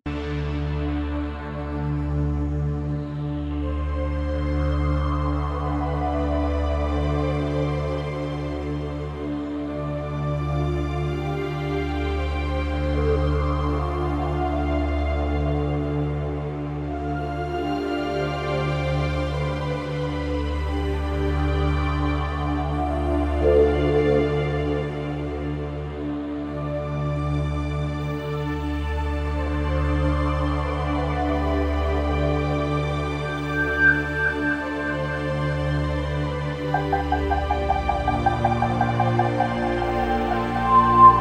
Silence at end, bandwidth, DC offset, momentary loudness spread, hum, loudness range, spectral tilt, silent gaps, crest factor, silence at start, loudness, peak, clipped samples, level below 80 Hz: 0 s; 8.8 kHz; under 0.1%; 7 LU; none; 5 LU; -8 dB/octave; none; 22 dB; 0.05 s; -24 LUFS; -2 dBFS; under 0.1%; -30 dBFS